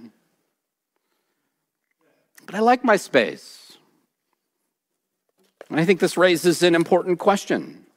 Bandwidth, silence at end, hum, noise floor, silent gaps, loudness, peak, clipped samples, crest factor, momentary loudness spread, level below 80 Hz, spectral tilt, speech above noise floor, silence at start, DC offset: 16 kHz; 0.25 s; none; -79 dBFS; none; -19 LUFS; -2 dBFS; under 0.1%; 20 dB; 10 LU; -72 dBFS; -5 dB/octave; 60 dB; 0.05 s; under 0.1%